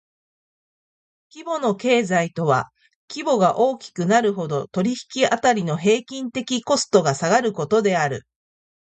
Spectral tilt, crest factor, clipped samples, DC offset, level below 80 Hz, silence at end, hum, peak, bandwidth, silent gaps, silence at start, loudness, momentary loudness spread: -4.5 dB/octave; 18 dB; under 0.1%; under 0.1%; -64 dBFS; 0.8 s; none; -4 dBFS; 9.2 kHz; 2.95-3.08 s; 1.35 s; -21 LUFS; 10 LU